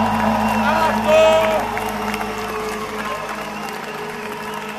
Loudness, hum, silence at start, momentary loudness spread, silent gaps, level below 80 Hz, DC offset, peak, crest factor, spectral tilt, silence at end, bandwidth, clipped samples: -19 LUFS; none; 0 s; 14 LU; none; -42 dBFS; under 0.1%; -2 dBFS; 18 dB; -4.5 dB/octave; 0 s; 14 kHz; under 0.1%